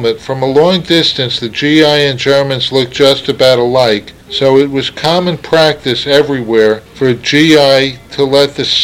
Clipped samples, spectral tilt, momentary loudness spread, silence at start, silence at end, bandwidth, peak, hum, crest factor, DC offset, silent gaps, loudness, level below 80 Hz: 0.5%; -5 dB/octave; 7 LU; 0 s; 0 s; 16.5 kHz; 0 dBFS; none; 10 dB; under 0.1%; none; -10 LUFS; -44 dBFS